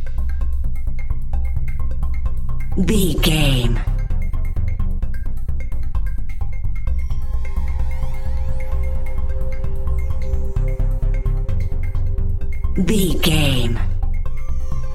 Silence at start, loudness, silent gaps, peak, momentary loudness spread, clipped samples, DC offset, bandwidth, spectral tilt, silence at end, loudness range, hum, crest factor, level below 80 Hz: 0 s; -23 LUFS; none; -2 dBFS; 10 LU; under 0.1%; under 0.1%; 14 kHz; -5.5 dB/octave; 0 s; 6 LU; none; 14 dB; -18 dBFS